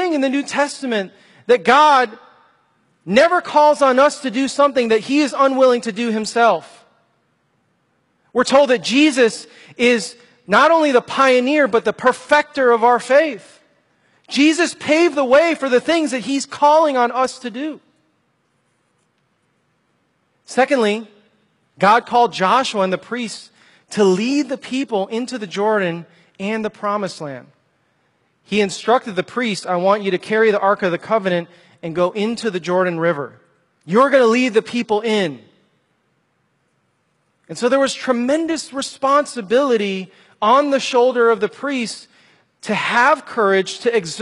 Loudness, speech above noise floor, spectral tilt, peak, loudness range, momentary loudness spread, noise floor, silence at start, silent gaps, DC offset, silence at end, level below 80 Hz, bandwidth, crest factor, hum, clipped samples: -17 LUFS; 49 dB; -4 dB/octave; 0 dBFS; 8 LU; 11 LU; -65 dBFS; 0 s; none; under 0.1%; 0 s; -66 dBFS; 11.5 kHz; 18 dB; none; under 0.1%